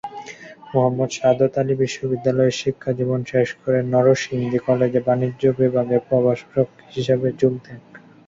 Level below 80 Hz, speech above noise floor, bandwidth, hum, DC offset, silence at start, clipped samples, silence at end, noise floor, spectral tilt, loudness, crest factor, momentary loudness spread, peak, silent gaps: -56 dBFS; 20 dB; 7.8 kHz; none; under 0.1%; 0.05 s; under 0.1%; 0.3 s; -39 dBFS; -6.5 dB/octave; -20 LUFS; 16 dB; 7 LU; -4 dBFS; none